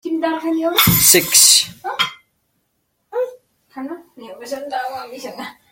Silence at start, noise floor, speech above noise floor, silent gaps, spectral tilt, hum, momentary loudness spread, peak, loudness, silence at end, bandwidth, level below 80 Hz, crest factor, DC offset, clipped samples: 0.05 s; -69 dBFS; 52 dB; none; -2 dB/octave; none; 23 LU; 0 dBFS; -13 LUFS; 0.2 s; 17 kHz; -48 dBFS; 18 dB; under 0.1%; under 0.1%